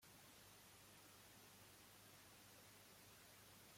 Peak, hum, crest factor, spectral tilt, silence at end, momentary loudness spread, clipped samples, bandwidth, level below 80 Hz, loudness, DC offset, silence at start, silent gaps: -54 dBFS; 50 Hz at -75 dBFS; 12 dB; -2.5 dB/octave; 0 s; 0 LU; under 0.1%; 16.5 kHz; -86 dBFS; -64 LUFS; under 0.1%; 0 s; none